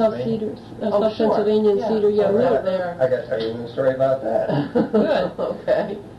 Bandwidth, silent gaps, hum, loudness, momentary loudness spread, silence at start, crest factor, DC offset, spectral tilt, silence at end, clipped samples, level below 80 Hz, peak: 8.2 kHz; none; none; -20 LUFS; 7 LU; 0 s; 14 dB; under 0.1%; -8 dB/octave; 0 s; under 0.1%; -54 dBFS; -6 dBFS